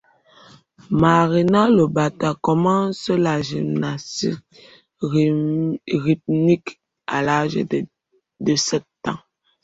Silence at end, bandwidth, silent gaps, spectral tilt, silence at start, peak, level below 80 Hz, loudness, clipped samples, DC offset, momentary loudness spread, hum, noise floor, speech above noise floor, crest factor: 0.45 s; 8 kHz; none; -6 dB/octave; 0.9 s; -2 dBFS; -54 dBFS; -20 LUFS; under 0.1%; under 0.1%; 13 LU; none; -50 dBFS; 32 dB; 18 dB